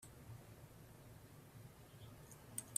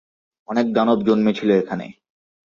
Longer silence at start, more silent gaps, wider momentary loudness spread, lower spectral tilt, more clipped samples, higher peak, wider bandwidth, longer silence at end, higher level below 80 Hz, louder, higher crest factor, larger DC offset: second, 0 s vs 0.5 s; neither; second, 9 LU vs 12 LU; second, -3.5 dB/octave vs -7.5 dB/octave; neither; second, -22 dBFS vs -4 dBFS; first, 15.5 kHz vs 7.2 kHz; second, 0 s vs 0.6 s; second, -72 dBFS vs -62 dBFS; second, -58 LUFS vs -19 LUFS; first, 32 dB vs 16 dB; neither